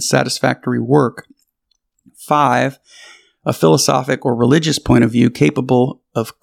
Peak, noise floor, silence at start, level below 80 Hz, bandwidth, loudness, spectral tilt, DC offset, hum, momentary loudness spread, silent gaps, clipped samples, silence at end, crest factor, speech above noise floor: 0 dBFS; -68 dBFS; 0 s; -46 dBFS; 16.5 kHz; -15 LUFS; -5 dB/octave; under 0.1%; none; 8 LU; none; under 0.1%; 0.1 s; 16 dB; 53 dB